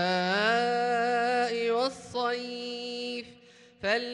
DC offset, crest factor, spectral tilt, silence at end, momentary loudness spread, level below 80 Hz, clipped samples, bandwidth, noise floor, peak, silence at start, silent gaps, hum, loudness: under 0.1%; 16 dB; -4 dB/octave; 0 s; 10 LU; -72 dBFS; under 0.1%; 11 kHz; -55 dBFS; -14 dBFS; 0 s; none; none; -28 LUFS